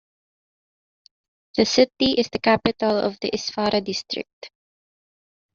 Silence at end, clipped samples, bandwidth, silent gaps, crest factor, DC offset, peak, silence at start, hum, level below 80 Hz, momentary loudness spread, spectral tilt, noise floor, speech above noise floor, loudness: 1.05 s; under 0.1%; 7.8 kHz; 4.33-4.42 s; 22 dB; under 0.1%; -4 dBFS; 1.55 s; none; -56 dBFS; 11 LU; -2.5 dB/octave; under -90 dBFS; over 68 dB; -22 LUFS